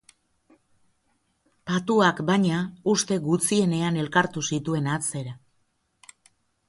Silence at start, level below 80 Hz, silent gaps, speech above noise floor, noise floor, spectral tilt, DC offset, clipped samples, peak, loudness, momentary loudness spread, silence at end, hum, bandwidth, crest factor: 1.65 s; -64 dBFS; none; 47 dB; -70 dBFS; -4.5 dB/octave; under 0.1%; under 0.1%; -6 dBFS; -24 LUFS; 8 LU; 1.3 s; none; 12 kHz; 20 dB